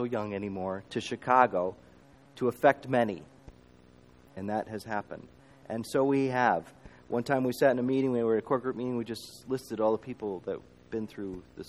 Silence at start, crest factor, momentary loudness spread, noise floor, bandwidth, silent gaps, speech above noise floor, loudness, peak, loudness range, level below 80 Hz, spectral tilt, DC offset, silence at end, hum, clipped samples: 0 s; 24 dB; 14 LU; -57 dBFS; 15 kHz; none; 28 dB; -30 LUFS; -6 dBFS; 5 LU; -64 dBFS; -6.5 dB/octave; under 0.1%; 0 s; none; under 0.1%